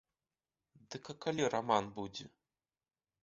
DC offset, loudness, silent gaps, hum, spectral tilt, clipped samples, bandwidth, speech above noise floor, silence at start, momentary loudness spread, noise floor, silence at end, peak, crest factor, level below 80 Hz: under 0.1%; -37 LUFS; none; none; -3.5 dB/octave; under 0.1%; 7.6 kHz; over 53 dB; 0.9 s; 16 LU; under -90 dBFS; 0.95 s; -16 dBFS; 26 dB; -74 dBFS